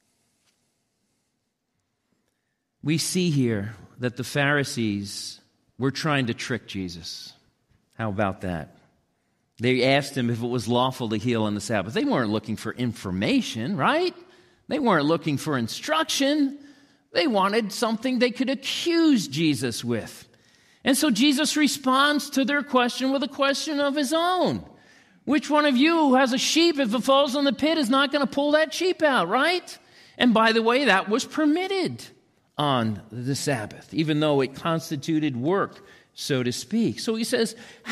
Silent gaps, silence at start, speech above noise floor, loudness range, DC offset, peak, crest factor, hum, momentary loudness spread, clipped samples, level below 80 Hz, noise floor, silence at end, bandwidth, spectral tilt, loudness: none; 2.85 s; 53 dB; 7 LU; under 0.1%; -8 dBFS; 18 dB; none; 11 LU; under 0.1%; -64 dBFS; -77 dBFS; 0 s; 15 kHz; -4.5 dB/octave; -23 LUFS